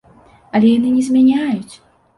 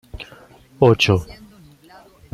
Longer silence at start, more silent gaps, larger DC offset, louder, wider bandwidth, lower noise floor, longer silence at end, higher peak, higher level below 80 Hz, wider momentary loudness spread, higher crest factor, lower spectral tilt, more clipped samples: first, 0.55 s vs 0.15 s; neither; neither; about the same, -15 LUFS vs -16 LUFS; second, 11.5 kHz vs 14.5 kHz; about the same, -47 dBFS vs -47 dBFS; second, 0.4 s vs 1 s; about the same, -2 dBFS vs -2 dBFS; second, -54 dBFS vs -46 dBFS; second, 9 LU vs 24 LU; second, 14 dB vs 20 dB; about the same, -6.5 dB/octave vs -6 dB/octave; neither